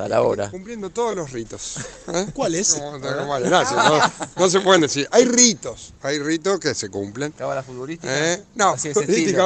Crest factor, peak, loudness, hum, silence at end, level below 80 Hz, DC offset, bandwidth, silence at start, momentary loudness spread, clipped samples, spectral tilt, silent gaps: 20 dB; 0 dBFS; -20 LUFS; none; 0 s; -54 dBFS; under 0.1%; 9.6 kHz; 0 s; 15 LU; under 0.1%; -3 dB/octave; none